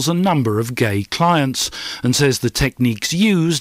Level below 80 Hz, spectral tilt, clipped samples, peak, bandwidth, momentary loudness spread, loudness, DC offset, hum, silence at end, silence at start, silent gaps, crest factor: -40 dBFS; -4.5 dB/octave; under 0.1%; -6 dBFS; 16 kHz; 4 LU; -17 LUFS; under 0.1%; none; 0 s; 0 s; none; 12 dB